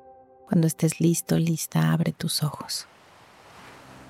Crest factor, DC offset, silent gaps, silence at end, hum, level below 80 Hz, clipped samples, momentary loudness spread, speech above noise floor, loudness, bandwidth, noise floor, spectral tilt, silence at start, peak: 16 dB; under 0.1%; none; 0 s; none; -64 dBFS; under 0.1%; 9 LU; 29 dB; -25 LUFS; 16 kHz; -52 dBFS; -5.5 dB/octave; 0.5 s; -12 dBFS